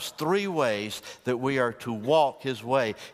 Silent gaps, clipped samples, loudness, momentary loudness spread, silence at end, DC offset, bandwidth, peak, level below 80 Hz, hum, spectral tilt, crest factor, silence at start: none; under 0.1%; -27 LUFS; 10 LU; 0 s; under 0.1%; 15.5 kHz; -10 dBFS; -68 dBFS; none; -5 dB/octave; 16 dB; 0 s